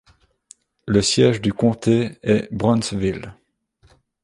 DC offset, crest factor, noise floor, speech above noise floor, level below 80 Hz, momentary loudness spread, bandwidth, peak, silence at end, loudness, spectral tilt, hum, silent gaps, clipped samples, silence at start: under 0.1%; 18 dB; -59 dBFS; 41 dB; -46 dBFS; 11 LU; 11.5 kHz; -2 dBFS; 0.9 s; -19 LUFS; -5.5 dB/octave; none; none; under 0.1%; 0.85 s